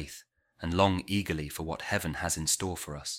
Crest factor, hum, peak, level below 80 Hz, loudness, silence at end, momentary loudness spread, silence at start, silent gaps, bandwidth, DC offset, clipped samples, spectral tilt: 22 dB; none; -10 dBFS; -50 dBFS; -31 LUFS; 0 s; 12 LU; 0 s; none; 17 kHz; under 0.1%; under 0.1%; -3.5 dB/octave